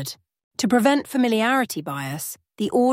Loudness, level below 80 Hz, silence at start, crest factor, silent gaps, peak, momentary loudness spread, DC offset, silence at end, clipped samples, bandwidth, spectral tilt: -22 LUFS; -66 dBFS; 0 s; 18 dB; 0.44-0.51 s; -4 dBFS; 15 LU; under 0.1%; 0 s; under 0.1%; 16.5 kHz; -4.5 dB/octave